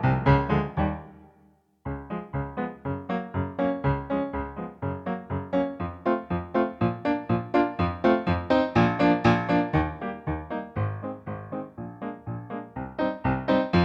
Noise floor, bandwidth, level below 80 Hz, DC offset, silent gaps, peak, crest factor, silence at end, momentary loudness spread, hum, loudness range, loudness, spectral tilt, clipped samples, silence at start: -61 dBFS; 7.4 kHz; -44 dBFS; under 0.1%; none; -8 dBFS; 20 dB; 0 s; 14 LU; none; 8 LU; -27 LUFS; -8.5 dB/octave; under 0.1%; 0 s